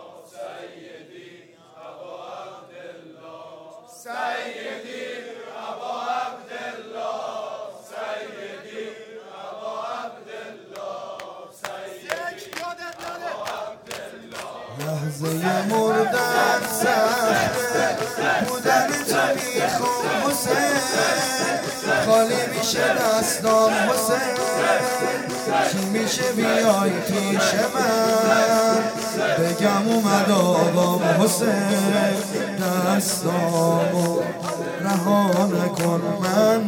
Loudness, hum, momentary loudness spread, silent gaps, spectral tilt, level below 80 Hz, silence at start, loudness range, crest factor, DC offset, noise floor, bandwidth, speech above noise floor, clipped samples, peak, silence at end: -21 LUFS; none; 18 LU; none; -4 dB/octave; -62 dBFS; 0 s; 14 LU; 18 dB; under 0.1%; -48 dBFS; 17.5 kHz; 28 dB; under 0.1%; -4 dBFS; 0 s